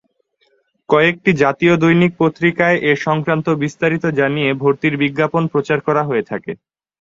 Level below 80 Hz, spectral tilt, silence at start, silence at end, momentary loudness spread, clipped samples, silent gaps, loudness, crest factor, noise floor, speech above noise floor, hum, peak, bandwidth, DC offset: -54 dBFS; -7 dB/octave; 0.9 s; 0.45 s; 6 LU; under 0.1%; none; -16 LUFS; 16 dB; -62 dBFS; 47 dB; none; 0 dBFS; 7.6 kHz; under 0.1%